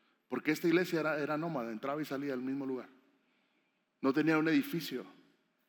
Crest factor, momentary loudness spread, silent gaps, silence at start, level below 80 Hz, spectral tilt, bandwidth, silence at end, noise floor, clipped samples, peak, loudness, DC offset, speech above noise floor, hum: 18 dB; 11 LU; none; 0.3 s; under -90 dBFS; -6 dB/octave; 19 kHz; 0.55 s; -78 dBFS; under 0.1%; -18 dBFS; -34 LUFS; under 0.1%; 44 dB; none